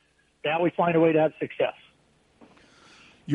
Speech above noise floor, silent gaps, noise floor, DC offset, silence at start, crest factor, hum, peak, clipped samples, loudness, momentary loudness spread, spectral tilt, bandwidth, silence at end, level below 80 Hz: 40 dB; none; -63 dBFS; under 0.1%; 0.45 s; 18 dB; none; -10 dBFS; under 0.1%; -25 LUFS; 10 LU; -8 dB/octave; 6.8 kHz; 0 s; -70 dBFS